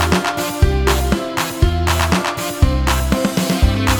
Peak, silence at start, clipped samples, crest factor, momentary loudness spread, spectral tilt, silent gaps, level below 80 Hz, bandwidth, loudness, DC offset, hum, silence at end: 0 dBFS; 0 s; under 0.1%; 16 dB; 3 LU; -5 dB/octave; none; -20 dBFS; 20 kHz; -17 LUFS; under 0.1%; none; 0 s